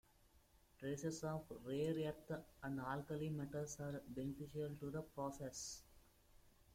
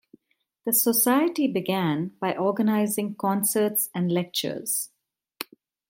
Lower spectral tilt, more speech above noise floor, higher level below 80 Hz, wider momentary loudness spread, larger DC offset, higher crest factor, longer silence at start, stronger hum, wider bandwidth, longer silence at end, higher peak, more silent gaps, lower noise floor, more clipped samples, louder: first, -5.5 dB/octave vs -4 dB/octave; second, 26 dB vs 49 dB; about the same, -70 dBFS vs -74 dBFS; second, 6 LU vs 15 LU; neither; about the same, 16 dB vs 16 dB; second, 0.35 s vs 0.65 s; neither; about the same, 16.5 kHz vs 17 kHz; second, 0.1 s vs 0.45 s; second, -32 dBFS vs -8 dBFS; neither; about the same, -72 dBFS vs -73 dBFS; neither; second, -47 LUFS vs -24 LUFS